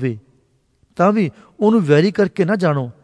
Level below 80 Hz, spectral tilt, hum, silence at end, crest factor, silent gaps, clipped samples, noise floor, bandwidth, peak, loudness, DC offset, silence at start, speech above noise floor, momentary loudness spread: -60 dBFS; -8 dB/octave; none; 0.1 s; 16 dB; none; under 0.1%; -60 dBFS; 10.5 kHz; 0 dBFS; -17 LUFS; under 0.1%; 0 s; 44 dB; 11 LU